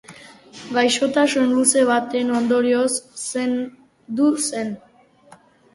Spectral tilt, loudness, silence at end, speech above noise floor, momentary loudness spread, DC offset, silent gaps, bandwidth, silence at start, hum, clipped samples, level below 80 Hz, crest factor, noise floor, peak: -2.5 dB/octave; -19 LUFS; 0.95 s; 31 dB; 13 LU; under 0.1%; none; 11.5 kHz; 0.1 s; none; under 0.1%; -64 dBFS; 20 dB; -50 dBFS; -2 dBFS